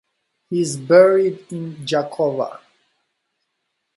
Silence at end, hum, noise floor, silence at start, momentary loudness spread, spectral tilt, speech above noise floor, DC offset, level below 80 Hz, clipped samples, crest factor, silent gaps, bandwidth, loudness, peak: 1.4 s; none; -75 dBFS; 0.5 s; 16 LU; -5.5 dB/octave; 57 dB; under 0.1%; -68 dBFS; under 0.1%; 20 dB; none; 11.5 kHz; -18 LUFS; 0 dBFS